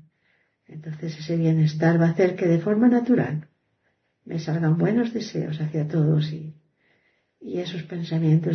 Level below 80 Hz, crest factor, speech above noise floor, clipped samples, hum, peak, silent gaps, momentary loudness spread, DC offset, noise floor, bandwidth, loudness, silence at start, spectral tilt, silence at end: -66 dBFS; 16 dB; 49 dB; under 0.1%; none; -8 dBFS; none; 14 LU; under 0.1%; -71 dBFS; 6.4 kHz; -23 LUFS; 0.7 s; -8.5 dB/octave; 0 s